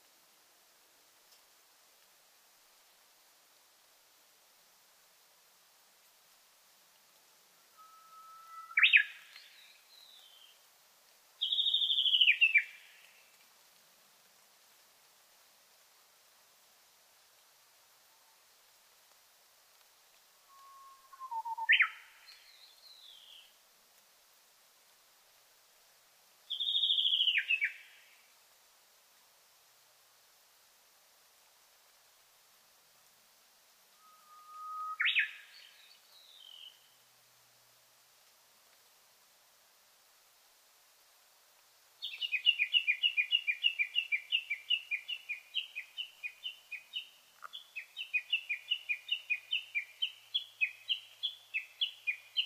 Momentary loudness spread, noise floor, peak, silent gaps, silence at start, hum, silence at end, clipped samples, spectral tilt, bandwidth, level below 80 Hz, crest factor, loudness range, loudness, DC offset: 28 LU; -66 dBFS; -10 dBFS; none; 7.8 s; none; 0 s; under 0.1%; 4 dB/octave; 15.5 kHz; under -90 dBFS; 30 dB; 11 LU; -31 LUFS; under 0.1%